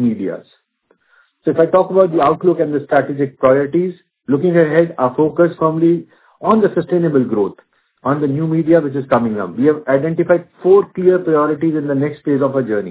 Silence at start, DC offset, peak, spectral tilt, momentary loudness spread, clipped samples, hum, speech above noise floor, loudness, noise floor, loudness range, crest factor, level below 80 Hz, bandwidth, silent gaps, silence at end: 0 s; under 0.1%; 0 dBFS; -12 dB/octave; 8 LU; under 0.1%; none; 46 dB; -15 LUFS; -60 dBFS; 2 LU; 14 dB; -56 dBFS; 4 kHz; none; 0 s